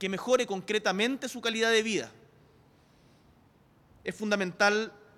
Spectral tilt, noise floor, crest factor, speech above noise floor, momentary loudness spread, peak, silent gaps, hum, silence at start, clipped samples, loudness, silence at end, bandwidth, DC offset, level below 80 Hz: -3.5 dB/octave; -62 dBFS; 18 dB; 33 dB; 10 LU; -12 dBFS; none; none; 0 s; under 0.1%; -28 LUFS; 0.25 s; 15.5 kHz; under 0.1%; -70 dBFS